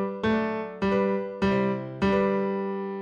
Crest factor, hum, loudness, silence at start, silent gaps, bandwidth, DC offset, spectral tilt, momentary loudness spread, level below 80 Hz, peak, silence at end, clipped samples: 14 dB; none; -26 LUFS; 0 s; none; 7.4 kHz; under 0.1%; -8 dB/octave; 5 LU; -50 dBFS; -12 dBFS; 0 s; under 0.1%